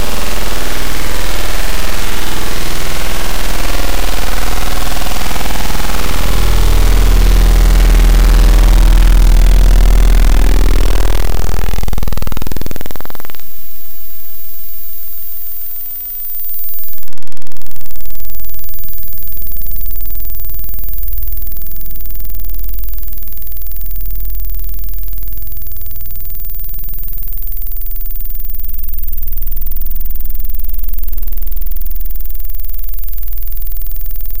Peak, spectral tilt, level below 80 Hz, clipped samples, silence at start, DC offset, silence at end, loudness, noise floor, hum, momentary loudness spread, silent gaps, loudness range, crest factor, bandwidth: 0 dBFS; -4.5 dB/octave; -14 dBFS; 0.6%; 0 s; under 0.1%; 0 s; -18 LUFS; -37 dBFS; none; 13 LU; none; 12 LU; 8 dB; 17 kHz